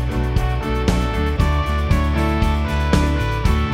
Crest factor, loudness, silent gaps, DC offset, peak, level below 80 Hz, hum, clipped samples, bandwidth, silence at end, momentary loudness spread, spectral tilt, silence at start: 16 dB; -19 LUFS; none; under 0.1%; -2 dBFS; -20 dBFS; none; under 0.1%; 14.5 kHz; 0 s; 3 LU; -6.5 dB/octave; 0 s